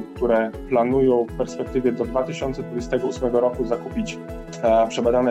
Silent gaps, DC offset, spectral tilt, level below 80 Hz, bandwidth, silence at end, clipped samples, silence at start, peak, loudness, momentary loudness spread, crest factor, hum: none; under 0.1%; -6.5 dB/octave; -40 dBFS; 11.5 kHz; 0 s; under 0.1%; 0 s; -8 dBFS; -22 LUFS; 10 LU; 14 dB; none